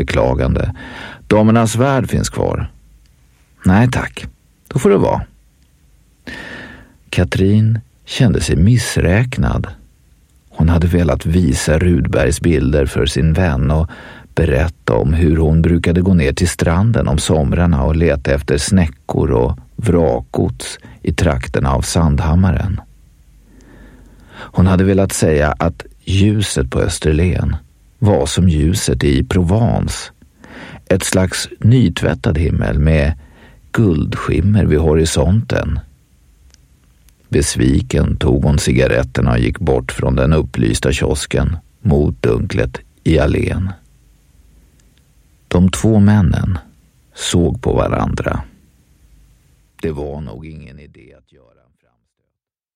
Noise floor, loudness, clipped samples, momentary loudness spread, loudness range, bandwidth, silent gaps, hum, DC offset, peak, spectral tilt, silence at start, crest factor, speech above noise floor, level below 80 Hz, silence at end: -78 dBFS; -15 LUFS; under 0.1%; 12 LU; 5 LU; 15.5 kHz; none; none; under 0.1%; 0 dBFS; -6 dB/octave; 0 s; 14 dB; 64 dB; -24 dBFS; 1.9 s